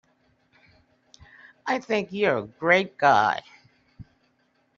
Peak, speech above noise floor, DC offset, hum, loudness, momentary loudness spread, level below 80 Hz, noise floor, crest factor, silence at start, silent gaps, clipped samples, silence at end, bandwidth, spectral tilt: -6 dBFS; 45 dB; under 0.1%; none; -23 LUFS; 10 LU; -66 dBFS; -68 dBFS; 22 dB; 1.65 s; none; under 0.1%; 0.75 s; 7.4 kHz; -2.5 dB/octave